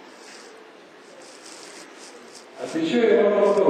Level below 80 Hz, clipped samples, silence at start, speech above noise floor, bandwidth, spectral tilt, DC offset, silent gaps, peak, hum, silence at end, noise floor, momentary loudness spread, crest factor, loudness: -82 dBFS; under 0.1%; 0.3 s; 28 dB; 10.5 kHz; -5 dB/octave; under 0.1%; none; -6 dBFS; none; 0 s; -47 dBFS; 25 LU; 18 dB; -20 LUFS